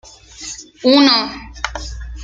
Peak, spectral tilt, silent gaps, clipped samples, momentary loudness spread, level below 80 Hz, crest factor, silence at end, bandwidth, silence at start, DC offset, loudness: -2 dBFS; -3.5 dB/octave; none; under 0.1%; 19 LU; -34 dBFS; 16 dB; 0 s; 7.8 kHz; 0.4 s; under 0.1%; -15 LUFS